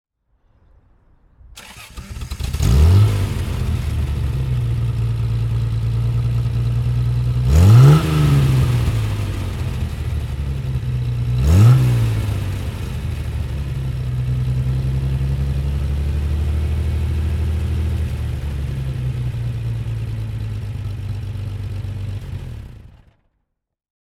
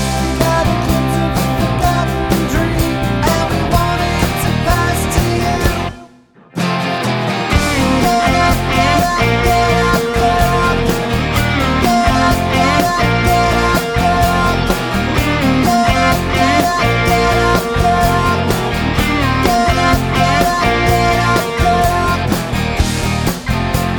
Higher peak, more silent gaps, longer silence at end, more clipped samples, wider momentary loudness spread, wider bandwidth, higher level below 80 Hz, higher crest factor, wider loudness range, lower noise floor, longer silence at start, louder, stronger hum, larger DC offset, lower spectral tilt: about the same, 0 dBFS vs 0 dBFS; neither; first, 1.15 s vs 0 s; neither; first, 14 LU vs 4 LU; second, 15 kHz vs over 20 kHz; about the same, -24 dBFS vs -24 dBFS; about the same, 18 dB vs 14 dB; first, 10 LU vs 3 LU; first, -72 dBFS vs -44 dBFS; first, 1.45 s vs 0 s; second, -19 LUFS vs -14 LUFS; neither; neither; first, -7.5 dB/octave vs -5 dB/octave